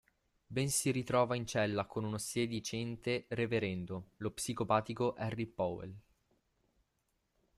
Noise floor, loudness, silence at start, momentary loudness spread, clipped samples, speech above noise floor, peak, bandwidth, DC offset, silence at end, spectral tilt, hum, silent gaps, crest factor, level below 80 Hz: -81 dBFS; -36 LUFS; 0.5 s; 9 LU; under 0.1%; 45 dB; -16 dBFS; 15 kHz; under 0.1%; 1.55 s; -4.5 dB/octave; none; none; 20 dB; -66 dBFS